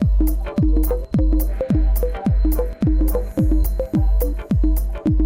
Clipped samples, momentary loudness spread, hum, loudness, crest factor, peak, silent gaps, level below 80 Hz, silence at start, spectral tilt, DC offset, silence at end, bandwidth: under 0.1%; 2 LU; none; -20 LUFS; 8 dB; -8 dBFS; none; -18 dBFS; 0 s; -8.5 dB/octave; under 0.1%; 0 s; 16.5 kHz